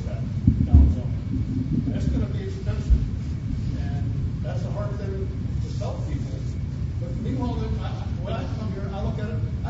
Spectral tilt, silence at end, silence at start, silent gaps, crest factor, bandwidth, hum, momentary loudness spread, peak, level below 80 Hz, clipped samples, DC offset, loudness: -8.5 dB/octave; 0 s; 0 s; none; 22 dB; 7.8 kHz; none; 7 LU; -2 dBFS; -28 dBFS; under 0.1%; under 0.1%; -26 LUFS